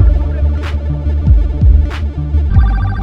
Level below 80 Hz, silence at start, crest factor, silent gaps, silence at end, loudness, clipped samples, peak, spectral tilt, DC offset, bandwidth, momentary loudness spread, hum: -12 dBFS; 0 s; 10 dB; none; 0 s; -14 LUFS; 0.2%; 0 dBFS; -9 dB/octave; under 0.1%; 5.2 kHz; 7 LU; none